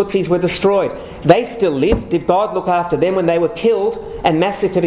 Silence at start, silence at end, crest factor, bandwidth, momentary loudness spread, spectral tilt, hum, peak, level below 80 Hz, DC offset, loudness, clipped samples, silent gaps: 0 s; 0 s; 16 dB; 4 kHz; 5 LU; -11 dB/octave; none; 0 dBFS; -36 dBFS; under 0.1%; -16 LUFS; under 0.1%; none